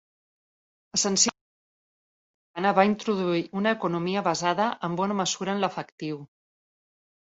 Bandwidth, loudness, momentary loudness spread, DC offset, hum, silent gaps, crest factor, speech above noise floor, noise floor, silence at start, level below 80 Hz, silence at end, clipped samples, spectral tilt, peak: 8.2 kHz; -26 LUFS; 13 LU; under 0.1%; none; 1.41-2.54 s, 5.92-5.98 s; 22 dB; over 64 dB; under -90 dBFS; 0.95 s; -70 dBFS; 1.05 s; under 0.1%; -3.5 dB/octave; -6 dBFS